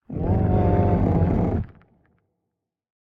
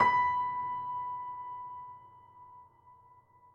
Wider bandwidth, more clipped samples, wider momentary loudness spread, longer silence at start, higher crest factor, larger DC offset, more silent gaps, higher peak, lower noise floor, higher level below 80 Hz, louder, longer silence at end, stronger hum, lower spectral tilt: second, 3.8 kHz vs 6.6 kHz; neither; second, 7 LU vs 26 LU; about the same, 0.1 s vs 0 s; about the same, 18 dB vs 22 dB; neither; neither; first, -6 dBFS vs -12 dBFS; first, -82 dBFS vs -61 dBFS; first, -34 dBFS vs -74 dBFS; first, -22 LUFS vs -34 LUFS; first, 1.35 s vs 0.6 s; neither; first, -11.5 dB/octave vs -5 dB/octave